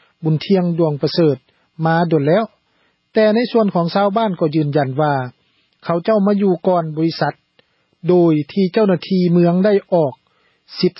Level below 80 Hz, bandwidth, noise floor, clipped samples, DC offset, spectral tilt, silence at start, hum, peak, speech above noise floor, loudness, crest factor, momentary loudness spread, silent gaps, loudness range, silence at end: -64 dBFS; 5.8 kHz; -62 dBFS; under 0.1%; under 0.1%; -11 dB/octave; 0.2 s; none; -2 dBFS; 47 dB; -16 LUFS; 14 dB; 8 LU; none; 2 LU; 0.1 s